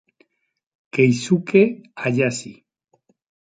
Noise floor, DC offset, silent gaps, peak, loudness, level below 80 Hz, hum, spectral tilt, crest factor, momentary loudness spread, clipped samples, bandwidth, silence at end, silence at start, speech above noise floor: -64 dBFS; under 0.1%; none; -2 dBFS; -19 LUFS; -64 dBFS; none; -6 dB/octave; 20 dB; 12 LU; under 0.1%; 9.4 kHz; 1.05 s; 0.95 s; 46 dB